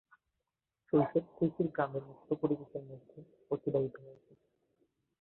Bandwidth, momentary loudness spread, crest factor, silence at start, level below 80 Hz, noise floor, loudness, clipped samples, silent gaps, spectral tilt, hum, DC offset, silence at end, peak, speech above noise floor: 4.2 kHz; 15 LU; 20 dB; 0.95 s; -72 dBFS; -88 dBFS; -35 LUFS; under 0.1%; none; -11.5 dB/octave; none; under 0.1%; 1.1 s; -18 dBFS; 53 dB